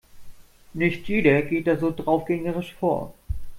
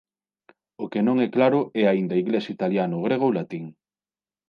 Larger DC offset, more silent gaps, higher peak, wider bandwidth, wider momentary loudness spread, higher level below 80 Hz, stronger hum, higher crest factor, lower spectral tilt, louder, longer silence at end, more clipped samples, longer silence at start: neither; neither; about the same, -6 dBFS vs -6 dBFS; first, 16 kHz vs 6.6 kHz; about the same, 11 LU vs 13 LU; first, -42 dBFS vs -74 dBFS; neither; about the same, 20 dB vs 18 dB; about the same, -8 dB/octave vs -9 dB/octave; about the same, -24 LUFS vs -23 LUFS; second, 0 s vs 0.8 s; neither; second, 0.15 s vs 0.8 s